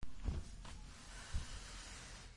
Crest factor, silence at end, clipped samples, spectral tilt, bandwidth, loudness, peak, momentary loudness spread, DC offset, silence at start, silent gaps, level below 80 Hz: 18 dB; 0 s; under 0.1%; -4 dB/octave; 11.5 kHz; -50 LUFS; -28 dBFS; 8 LU; under 0.1%; 0 s; none; -50 dBFS